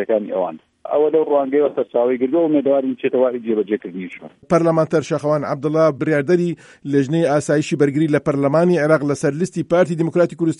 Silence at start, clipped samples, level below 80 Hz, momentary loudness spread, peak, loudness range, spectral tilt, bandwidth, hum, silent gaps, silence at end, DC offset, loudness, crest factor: 0 s; under 0.1%; -60 dBFS; 7 LU; -2 dBFS; 2 LU; -7 dB/octave; 11 kHz; none; none; 0.05 s; under 0.1%; -18 LUFS; 14 dB